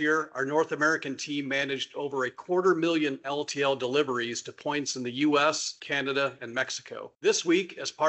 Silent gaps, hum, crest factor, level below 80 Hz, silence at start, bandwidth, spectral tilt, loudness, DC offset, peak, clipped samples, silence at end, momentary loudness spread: none; none; 18 dB; -76 dBFS; 0 s; 8.2 kHz; -3 dB/octave; -28 LUFS; under 0.1%; -10 dBFS; under 0.1%; 0 s; 8 LU